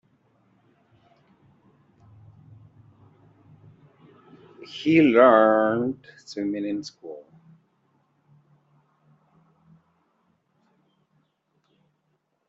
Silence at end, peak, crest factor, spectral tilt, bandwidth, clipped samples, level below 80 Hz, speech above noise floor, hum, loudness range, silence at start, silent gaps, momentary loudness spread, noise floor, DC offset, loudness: 5.3 s; -2 dBFS; 24 dB; -4.5 dB/octave; 7.6 kHz; under 0.1%; -72 dBFS; 53 dB; none; 14 LU; 4.6 s; none; 27 LU; -73 dBFS; under 0.1%; -20 LUFS